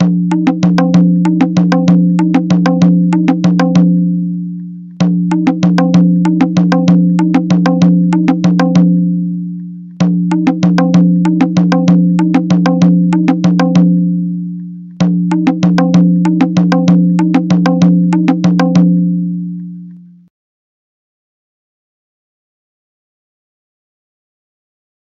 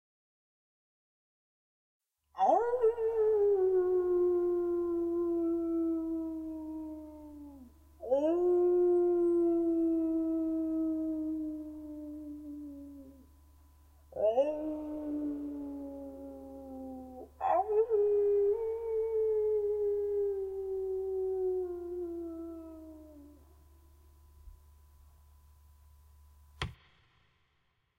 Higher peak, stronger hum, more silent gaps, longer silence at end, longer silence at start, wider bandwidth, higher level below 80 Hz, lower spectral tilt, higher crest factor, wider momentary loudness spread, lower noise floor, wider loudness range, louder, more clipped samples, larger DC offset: first, 0 dBFS vs -16 dBFS; neither; neither; first, 5 s vs 1.25 s; second, 0 s vs 2.35 s; first, 7.2 kHz vs 6.4 kHz; first, -50 dBFS vs -60 dBFS; about the same, -8 dB/octave vs -8 dB/octave; second, 10 dB vs 18 dB; second, 9 LU vs 19 LU; second, -33 dBFS vs -76 dBFS; second, 2 LU vs 13 LU; first, -11 LUFS vs -32 LUFS; first, 0.2% vs under 0.1%; neither